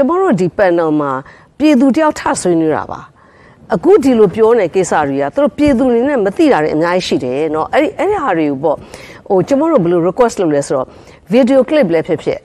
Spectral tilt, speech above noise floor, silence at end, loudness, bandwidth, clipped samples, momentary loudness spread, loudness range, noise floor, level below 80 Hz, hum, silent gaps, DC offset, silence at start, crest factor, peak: -6 dB/octave; 31 dB; 0.05 s; -13 LUFS; 12.5 kHz; under 0.1%; 8 LU; 3 LU; -43 dBFS; -44 dBFS; none; none; under 0.1%; 0 s; 12 dB; 0 dBFS